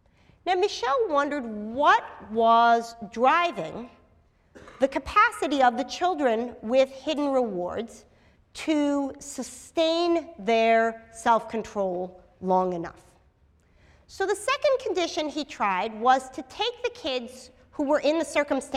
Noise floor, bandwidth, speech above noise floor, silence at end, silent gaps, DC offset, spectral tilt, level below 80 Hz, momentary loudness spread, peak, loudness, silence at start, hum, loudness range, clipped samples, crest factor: -61 dBFS; 14 kHz; 36 dB; 0 s; none; under 0.1%; -4 dB/octave; -58 dBFS; 14 LU; -8 dBFS; -25 LUFS; 0.45 s; none; 5 LU; under 0.1%; 18 dB